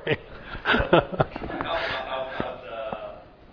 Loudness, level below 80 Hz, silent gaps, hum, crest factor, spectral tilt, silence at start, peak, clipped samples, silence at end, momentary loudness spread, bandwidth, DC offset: -27 LUFS; -44 dBFS; none; none; 24 dB; -7.5 dB/octave; 0 s; -2 dBFS; under 0.1%; 0 s; 16 LU; 5.4 kHz; under 0.1%